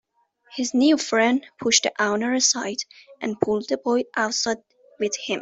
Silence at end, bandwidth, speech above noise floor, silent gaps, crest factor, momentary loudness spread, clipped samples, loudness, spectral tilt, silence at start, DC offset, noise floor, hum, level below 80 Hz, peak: 0 s; 8.2 kHz; 36 dB; none; 22 dB; 12 LU; under 0.1%; -22 LUFS; -2 dB/octave; 0.5 s; under 0.1%; -58 dBFS; none; -66 dBFS; -2 dBFS